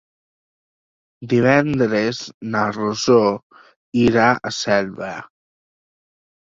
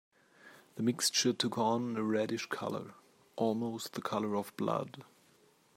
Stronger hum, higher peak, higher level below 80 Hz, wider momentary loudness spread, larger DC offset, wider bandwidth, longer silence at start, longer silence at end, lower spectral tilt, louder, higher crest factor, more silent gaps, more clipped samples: neither; first, -2 dBFS vs -16 dBFS; first, -54 dBFS vs -82 dBFS; about the same, 14 LU vs 16 LU; neither; second, 7.8 kHz vs 16 kHz; first, 1.2 s vs 0.45 s; first, 1.25 s vs 0.75 s; first, -5.5 dB/octave vs -4 dB/octave; first, -18 LUFS vs -34 LUFS; about the same, 18 dB vs 20 dB; first, 2.34-2.41 s, 3.43-3.50 s, 3.76-3.92 s vs none; neither